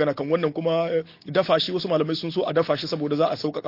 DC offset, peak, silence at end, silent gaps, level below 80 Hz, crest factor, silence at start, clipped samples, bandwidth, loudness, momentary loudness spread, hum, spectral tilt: under 0.1%; -6 dBFS; 0 s; none; -66 dBFS; 16 dB; 0 s; under 0.1%; 5.8 kHz; -24 LUFS; 4 LU; none; -6.5 dB/octave